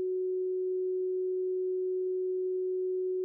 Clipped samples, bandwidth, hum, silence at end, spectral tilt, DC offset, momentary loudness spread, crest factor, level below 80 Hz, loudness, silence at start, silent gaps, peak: under 0.1%; 0.5 kHz; none; 0 s; -4.5 dB/octave; under 0.1%; 0 LU; 4 dB; under -90 dBFS; -32 LUFS; 0 s; none; -28 dBFS